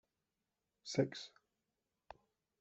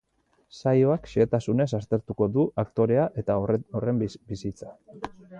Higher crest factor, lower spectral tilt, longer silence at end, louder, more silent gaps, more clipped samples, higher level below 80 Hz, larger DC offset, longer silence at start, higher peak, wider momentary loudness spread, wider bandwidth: first, 26 dB vs 16 dB; second, -5.5 dB/octave vs -8.5 dB/octave; first, 1.3 s vs 0 s; second, -41 LUFS vs -26 LUFS; neither; neither; second, -82 dBFS vs -54 dBFS; neither; first, 0.85 s vs 0.55 s; second, -20 dBFS vs -10 dBFS; first, 23 LU vs 15 LU; about the same, 8.2 kHz vs 9 kHz